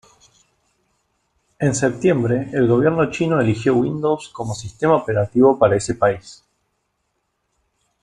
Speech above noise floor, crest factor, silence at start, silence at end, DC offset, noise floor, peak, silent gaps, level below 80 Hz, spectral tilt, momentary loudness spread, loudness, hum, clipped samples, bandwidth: 54 dB; 18 dB; 1.6 s; 1.7 s; under 0.1%; -72 dBFS; -2 dBFS; none; -52 dBFS; -6.5 dB/octave; 8 LU; -18 LUFS; none; under 0.1%; 11 kHz